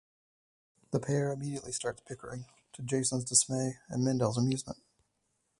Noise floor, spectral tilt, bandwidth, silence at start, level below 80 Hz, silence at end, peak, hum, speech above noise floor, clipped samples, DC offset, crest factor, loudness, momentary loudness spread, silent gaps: -79 dBFS; -4.5 dB/octave; 11.5 kHz; 0.9 s; -66 dBFS; 0.85 s; -10 dBFS; none; 46 dB; under 0.1%; under 0.1%; 24 dB; -31 LUFS; 18 LU; none